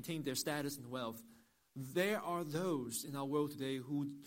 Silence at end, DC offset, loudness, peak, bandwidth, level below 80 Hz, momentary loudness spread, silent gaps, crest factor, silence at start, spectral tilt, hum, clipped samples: 0 s; under 0.1%; -40 LUFS; -22 dBFS; 16.5 kHz; -78 dBFS; 8 LU; none; 18 dB; 0 s; -4.5 dB/octave; none; under 0.1%